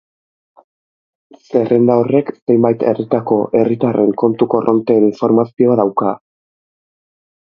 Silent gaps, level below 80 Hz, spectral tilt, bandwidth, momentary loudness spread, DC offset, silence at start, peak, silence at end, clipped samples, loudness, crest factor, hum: 2.42-2.47 s; -58 dBFS; -10.5 dB/octave; 6.4 kHz; 5 LU; under 0.1%; 1.5 s; 0 dBFS; 1.45 s; under 0.1%; -14 LUFS; 14 dB; none